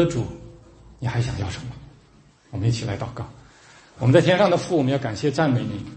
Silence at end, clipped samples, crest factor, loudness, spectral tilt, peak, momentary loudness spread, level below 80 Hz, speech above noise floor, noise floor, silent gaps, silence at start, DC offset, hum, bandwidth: 0 s; under 0.1%; 20 dB; -22 LUFS; -6.5 dB/octave; -2 dBFS; 19 LU; -48 dBFS; 32 dB; -54 dBFS; none; 0 s; under 0.1%; none; 8.8 kHz